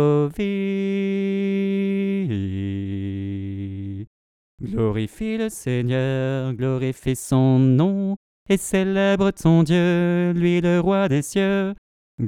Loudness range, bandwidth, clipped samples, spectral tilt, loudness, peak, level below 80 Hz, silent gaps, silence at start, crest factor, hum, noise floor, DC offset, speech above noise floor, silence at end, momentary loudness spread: 8 LU; 14.5 kHz; under 0.1%; -7 dB/octave; -21 LUFS; -4 dBFS; -48 dBFS; 4.07-4.58 s, 8.17-8.46 s, 11.78-12.18 s; 0 s; 16 dB; none; under -90 dBFS; under 0.1%; over 70 dB; 0 s; 11 LU